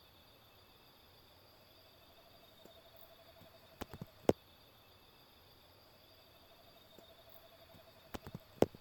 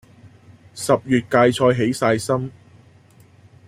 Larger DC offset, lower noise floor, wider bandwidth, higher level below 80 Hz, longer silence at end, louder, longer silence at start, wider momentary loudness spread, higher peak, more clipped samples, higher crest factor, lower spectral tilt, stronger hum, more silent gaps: neither; first, -64 dBFS vs -50 dBFS; first, 18 kHz vs 15.5 kHz; second, -70 dBFS vs -56 dBFS; second, 0.15 s vs 1.15 s; second, -43 LUFS vs -19 LUFS; first, 3.8 s vs 0.25 s; first, 25 LU vs 13 LU; second, -12 dBFS vs -2 dBFS; neither; first, 36 dB vs 18 dB; about the same, -6 dB/octave vs -5.5 dB/octave; neither; neither